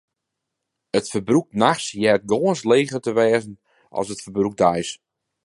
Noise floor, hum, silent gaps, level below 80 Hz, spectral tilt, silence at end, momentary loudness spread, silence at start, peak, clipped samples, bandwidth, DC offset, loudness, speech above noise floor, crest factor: -81 dBFS; none; none; -58 dBFS; -5 dB/octave; 0.5 s; 10 LU; 0.95 s; -2 dBFS; under 0.1%; 11.5 kHz; under 0.1%; -21 LUFS; 61 dB; 20 dB